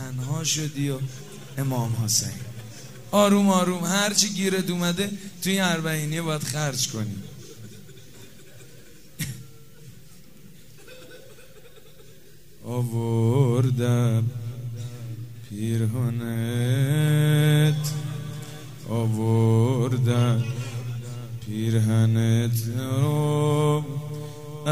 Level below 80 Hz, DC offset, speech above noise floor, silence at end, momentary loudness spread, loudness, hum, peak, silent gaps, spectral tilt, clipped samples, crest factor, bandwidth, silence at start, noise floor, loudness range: -58 dBFS; 0.5%; 29 dB; 0 s; 17 LU; -24 LUFS; none; -4 dBFS; none; -5 dB/octave; under 0.1%; 22 dB; 16 kHz; 0 s; -51 dBFS; 18 LU